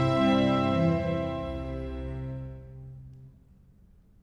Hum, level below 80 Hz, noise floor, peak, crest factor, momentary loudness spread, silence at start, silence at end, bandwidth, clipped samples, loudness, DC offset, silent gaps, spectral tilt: none; -44 dBFS; -57 dBFS; -14 dBFS; 16 dB; 22 LU; 0 s; 0.9 s; 10.5 kHz; under 0.1%; -28 LUFS; under 0.1%; none; -8 dB/octave